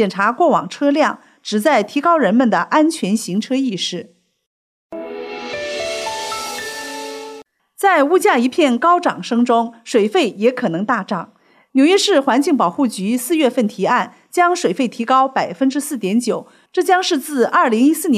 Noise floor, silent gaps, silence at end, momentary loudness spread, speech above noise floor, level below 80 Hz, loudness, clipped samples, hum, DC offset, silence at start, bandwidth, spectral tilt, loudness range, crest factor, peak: -39 dBFS; 4.47-4.90 s; 0 s; 12 LU; 23 dB; -66 dBFS; -17 LUFS; under 0.1%; none; under 0.1%; 0 s; 15.5 kHz; -4 dB/octave; 8 LU; 14 dB; -2 dBFS